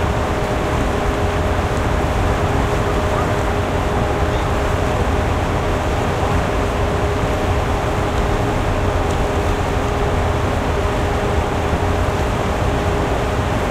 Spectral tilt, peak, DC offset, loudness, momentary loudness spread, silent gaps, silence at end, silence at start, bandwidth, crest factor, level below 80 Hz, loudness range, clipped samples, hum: -6 dB/octave; -4 dBFS; under 0.1%; -19 LUFS; 1 LU; none; 0 s; 0 s; 15.5 kHz; 14 dB; -24 dBFS; 0 LU; under 0.1%; none